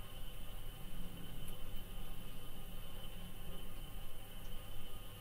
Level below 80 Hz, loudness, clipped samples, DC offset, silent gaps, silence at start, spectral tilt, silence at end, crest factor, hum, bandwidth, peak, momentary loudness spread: -48 dBFS; -52 LUFS; under 0.1%; under 0.1%; none; 0 s; -4 dB/octave; 0 s; 10 dB; none; 16 kHz; -30 dBFS; 2 LU